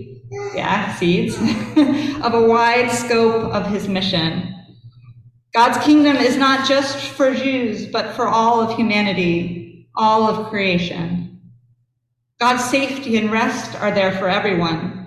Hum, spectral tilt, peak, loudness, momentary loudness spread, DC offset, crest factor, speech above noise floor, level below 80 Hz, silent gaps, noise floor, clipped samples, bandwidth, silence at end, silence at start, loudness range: none; -5 dB/octave; -2 dBFS; -17 LUFS; 9 LU; under 0.1%; 16 dB; 55 dB; -50 dBFS; none; -72 dBFS; under 0.1%; 14 kHz; 0 s; 0 s; 4 LU